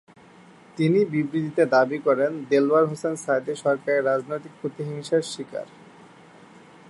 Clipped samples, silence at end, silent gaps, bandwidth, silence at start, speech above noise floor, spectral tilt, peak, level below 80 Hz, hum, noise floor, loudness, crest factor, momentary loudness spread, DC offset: under 0.1%; 1.25 s; none; 11.5 kHz; 0.75 s; 27 dB; -6 dB/octave; -6 dBFS; -72 dBFS; none; -50 dBFS; -23 LUFS; 18 dB; 14 LU; under 0.1%